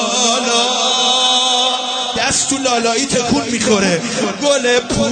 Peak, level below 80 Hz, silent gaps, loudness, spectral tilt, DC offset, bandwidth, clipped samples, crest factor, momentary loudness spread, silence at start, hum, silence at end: 0 dBFS; -44 dBFS; none; -14 LUFS; -2 dB/octave; under 0.1%; 9.4 kHz; under 0.1%; 14 dB; 5 LU; 0 s; none; 0 s